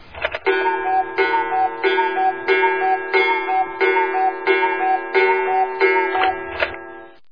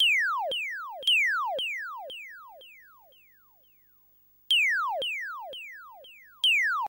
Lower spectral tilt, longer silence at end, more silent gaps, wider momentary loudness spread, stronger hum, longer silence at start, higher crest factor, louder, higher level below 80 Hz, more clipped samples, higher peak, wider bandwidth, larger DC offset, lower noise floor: first, -5.5 dB/octave vs 2.5 dB/octave; first, 0.25 s vs 0 s; neither; second, 6 LU vs 21 LU; second, none vs 50 Hz at -80 dBFS; about the same, 0 s vs 0 s; about the same, 16 dB vs 14 dB; first, -18 LUFS vs -26 LUFS; first, -54 dBFS vs -78 dBFS; neither; first, -4 dBFS vs -16 dBFS; second, 5.2 kHz vs 16 kHz; first, 0.5% vs under 0.1%; second, -38 dBFS vs -62 dBFS